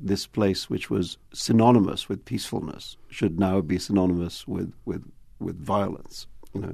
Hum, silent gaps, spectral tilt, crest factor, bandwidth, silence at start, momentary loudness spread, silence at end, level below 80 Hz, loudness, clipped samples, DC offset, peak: none; none; -6 dB/octave; 20 dB; 13.5 kHz; 0 s; 16 LU; 0 s; -50 dBFS; -25 LUFS; under 0.1%; under 0.1%; -6 dBFS